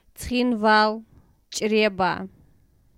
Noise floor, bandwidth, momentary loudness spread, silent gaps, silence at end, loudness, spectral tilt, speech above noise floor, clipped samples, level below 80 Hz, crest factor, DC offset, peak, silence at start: -58 dBFS; 16 kHz; 15 LU; none; 0.7 s; -22 LUFS; -4 dB/octave; 37 dB; under 0.1%; -50 dBFS; 18 dB; under 0.1%; -6 dBFS; 0.2 s